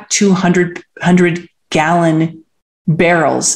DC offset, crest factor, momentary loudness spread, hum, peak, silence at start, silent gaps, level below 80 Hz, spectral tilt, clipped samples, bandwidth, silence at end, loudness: under 0.1%; 12 dB; 9 LU; none; 0 dBFS; 0 s; 2.62-2.85 s; -50 dBFS; -4.5 dB/octave; under 0.1%; 12.5 kHz; 0 s; -13 LUFS